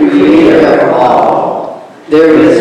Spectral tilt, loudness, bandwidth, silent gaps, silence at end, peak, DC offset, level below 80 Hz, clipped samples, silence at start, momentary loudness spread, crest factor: -7 dB/octave; -7 LUFS; 9.4 kHz; none; 0 s; 0 dBFS; under 0.1%; -42 dBFS; 7%; 0 s; 10 LU; 6 dB